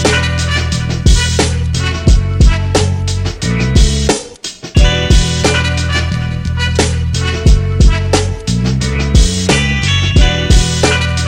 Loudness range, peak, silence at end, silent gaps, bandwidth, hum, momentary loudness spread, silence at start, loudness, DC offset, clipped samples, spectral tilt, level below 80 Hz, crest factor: 1 LU; 0 dBFS; 0 s; none; 11.5 kHz; none; 5 LU; 0 s; -13 LUFS; under 0.1%; under 0.1%; -4.5 dB/octave; -14 dBFS; 12 dB